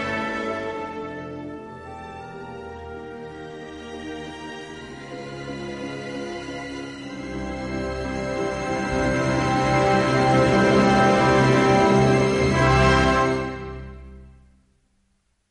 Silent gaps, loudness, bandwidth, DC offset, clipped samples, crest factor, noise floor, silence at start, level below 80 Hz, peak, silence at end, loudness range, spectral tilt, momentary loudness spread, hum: none; -21 LUFS; 11.5 kHz; under 0.1%; under 0.1%; 18 dB; -68 dBFS; 0 s; -38 dBFS; -6 dBFS; 1.2 s; 18 LU; -6 dB/octave; 20 LU; none